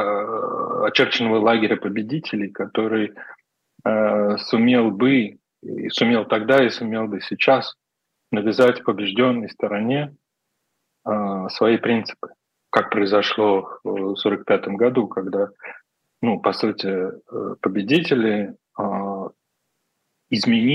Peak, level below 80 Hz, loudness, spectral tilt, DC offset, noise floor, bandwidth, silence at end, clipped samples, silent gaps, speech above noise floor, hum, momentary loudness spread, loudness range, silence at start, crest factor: 0 dBFS; -74 dBFS; -21 LUFS; -6.5 dB/octave; under 0.1%; -77 dBFS; 9.2 kHz; 0 s; under 0.1%; none; 57 dB; none; 12 LU; 4 LU; 0 s; 20 dB